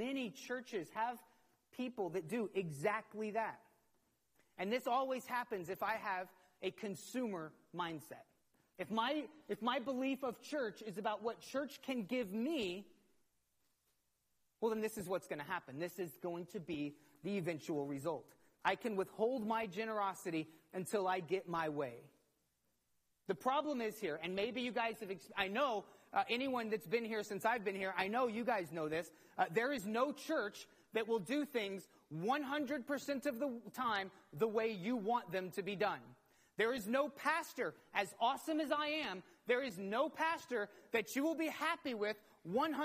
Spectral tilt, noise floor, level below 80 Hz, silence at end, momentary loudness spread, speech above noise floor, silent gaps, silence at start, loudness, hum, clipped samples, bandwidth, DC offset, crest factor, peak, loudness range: -4.5 dB/octave; -82 dBFS; -82 dBFS; 0 s; 9 LU; 42 dB; none; 0 s; -40 LUFS; none; under 0.1%; 15 kHz; under 0.1%; 22 dB; -20 dBFS; 5 LU